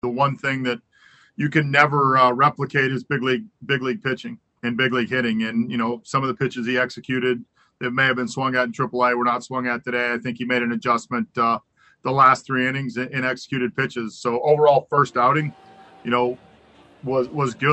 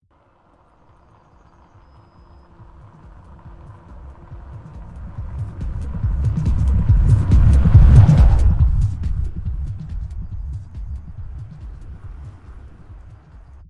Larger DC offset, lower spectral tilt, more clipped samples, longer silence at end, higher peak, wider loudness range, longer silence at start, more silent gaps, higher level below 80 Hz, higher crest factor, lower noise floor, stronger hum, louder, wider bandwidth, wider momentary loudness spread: neither; second, -6 dB/octave vs -9 dB/octave; neither; second, 0 s vs 0.55 s; about the same, -2 dBFS vs 0 dBFS; second, 3 LU vs 21 LU; second, 0.05 s vs 3.45 s; neither; second, -64 dBFS vs -22 dBFS; about the same, 20 dB vs 18 dB; about the same, -54 dBFS vs -56 dBFS; neither; second, -21 LUFS vs -17 LUFS; first, 8.6 kHz vs 6.8 kHz; second, 11 LU vs 26 LU